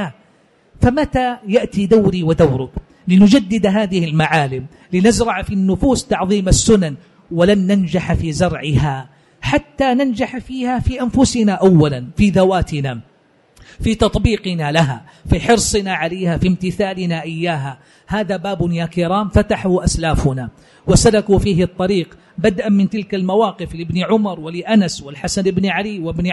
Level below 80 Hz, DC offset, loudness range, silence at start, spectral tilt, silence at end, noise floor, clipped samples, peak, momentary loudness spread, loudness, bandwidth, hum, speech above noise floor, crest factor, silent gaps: -30 dBFS; under 0.1%; 4 LU; 0 s; -5.5 dB/octave; 0 s; -53 dBFS; under 0.1%; -2 dBFS; 10 LU; -16 LUFS; 11.5 kHz; none; 38 dB; 14 dB; none